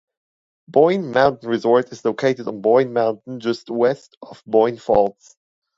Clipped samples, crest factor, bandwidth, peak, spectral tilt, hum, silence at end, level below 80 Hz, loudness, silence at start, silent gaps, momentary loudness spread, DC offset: under 0.1%; 18 dB; 7.8 kHz; 0 dBFS; -6.5 dB/octave; none; 0.65 s; -56 dBFS; -19 LUFS; 0.7 s; 4.17-4.21 s; 8 LU; under 0.1%